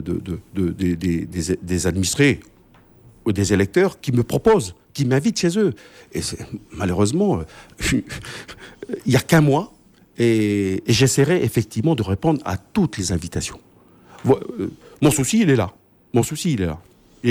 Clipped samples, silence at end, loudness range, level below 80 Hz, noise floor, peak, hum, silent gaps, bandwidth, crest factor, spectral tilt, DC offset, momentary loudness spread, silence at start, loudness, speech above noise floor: under 0.1%; 0 s; 4 LU; -44 dBFS; -51 dBFS; -4 dBFS; none; none; 20 kHz; 18 dB; -5.5 dB/octave; under 0.1%; 14 LU; 0 s; -20 LUFS; 31 dB